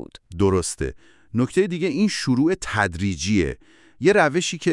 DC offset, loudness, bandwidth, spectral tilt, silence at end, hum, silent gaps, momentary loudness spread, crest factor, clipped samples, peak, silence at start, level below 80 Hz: under 0.1%; -22 LUFS; 12 kHz; -5 dB/octave; 0 s; none; none; 11 LU; 20 dB; under 0.1%; -2 dBFS; 0 s; -44 dBFS